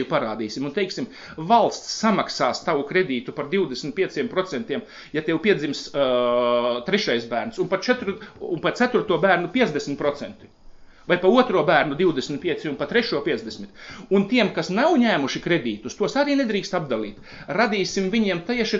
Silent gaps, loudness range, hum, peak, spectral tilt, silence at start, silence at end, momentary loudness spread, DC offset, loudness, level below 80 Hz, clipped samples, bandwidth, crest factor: none; 2 LU; none; -4 dBFS; -5 dB/octave; 0 s; 0 s; 11 LU; under 0.1%; -22 LUFS; -56 dBFS; under 0.1%; 7.8 kHz; 20 dB